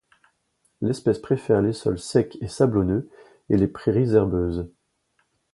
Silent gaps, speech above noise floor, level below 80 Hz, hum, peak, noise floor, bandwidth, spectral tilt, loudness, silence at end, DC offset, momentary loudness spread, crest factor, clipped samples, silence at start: none; 48 dB; -44 dBFS; none; -4 dBFS; -70 dBFS; 11.5 kHz; -7.5 dB/octave; -23 LUFS; 0.85 s; under 0.1%; 9 LU; 20 dB; under 0.1%; 0.8 s